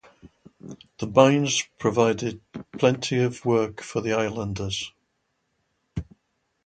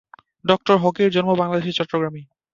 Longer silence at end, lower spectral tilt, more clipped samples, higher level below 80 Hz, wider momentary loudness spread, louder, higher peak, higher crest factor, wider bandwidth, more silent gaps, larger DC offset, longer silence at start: first, 0.6 s vs 0.3 s; second, -5 dB/octave vs -6.5 dB/octave; neither; first, -52 dBFS vs -60 dBFS; first, 20 LU vs 11 LU; second, -23 LUFS vs -20 LUFS; about the same, 0 dBFS vs 0 dBFS; first, 26 dB vs 20 dB; first, 9.2 kHz vs 7.4 kHz; neither; neither; second, 0.25 s vs 0.45 s